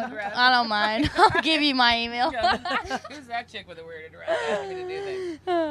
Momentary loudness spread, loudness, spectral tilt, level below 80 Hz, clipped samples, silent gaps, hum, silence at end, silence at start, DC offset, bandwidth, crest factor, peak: 17 LU; -23 LUFS; -4 dB/octave; -50 dBFS; under 0.1%; none; none; 0 s; 0 s; under 0.1%; 13 kHz; 22 dB; -2 dBFS